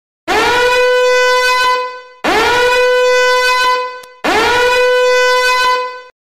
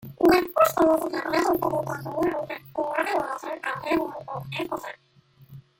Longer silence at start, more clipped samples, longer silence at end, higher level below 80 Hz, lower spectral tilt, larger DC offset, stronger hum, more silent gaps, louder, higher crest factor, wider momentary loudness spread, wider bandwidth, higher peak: first, 0.25 s vs 0 s; neither; about the same, 0.25 s vs 0.2 s; first, -42 dBFS vs -56 dBFS; second, -1.5 dB/octave vs -5 dB/octave; neither; neither; neither; first, -11 LUFS vs -25 LUFS; second, 6 dB vs 18 dB; second, 7 LU vs 13 LU; about the same, 15.5 kHz vs 17 kHz; about the same, -6 dBFS vs -6 dBFS